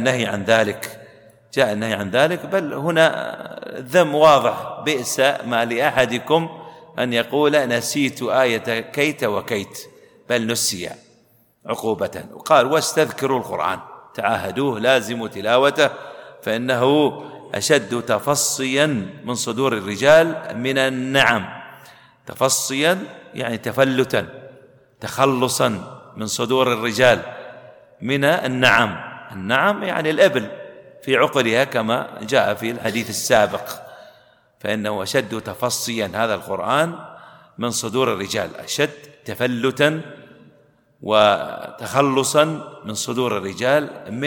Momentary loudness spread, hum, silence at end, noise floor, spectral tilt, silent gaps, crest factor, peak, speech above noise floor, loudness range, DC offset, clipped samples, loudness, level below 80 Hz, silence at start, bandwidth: 15 LU; none; 0 s; -57 dBFS; -3.5 dB/octave; none; 20 dB; 0 dBFS; 38 dB; 4 LU; under 0.1%; under 0.1%; -19 LUFS; -60 dBFS; 0 s; 19 kHz